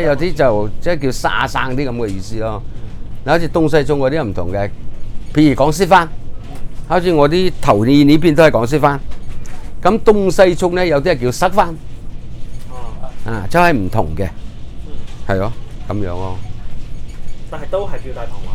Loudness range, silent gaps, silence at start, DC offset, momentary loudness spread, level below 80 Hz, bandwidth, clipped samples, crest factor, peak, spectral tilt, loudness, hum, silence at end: 11 LU; none; 0 s; under 0.1%; 22 LU; -26 dBFS; 13.5 kHz; 0.2%; 14 dB; 0 dBFS; -6.5 dB/octave; -15 LUFS; none; 0 s